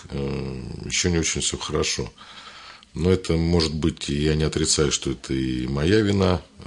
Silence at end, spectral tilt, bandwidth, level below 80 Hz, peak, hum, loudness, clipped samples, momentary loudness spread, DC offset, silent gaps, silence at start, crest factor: 0 s; -4.5 dB/octave; 11 kHz; -40 dBFS; -6 dBFS; none; -23 LUFS; under 0.1%; 15 LU; under 0.1%; none; 0 s; 18 dB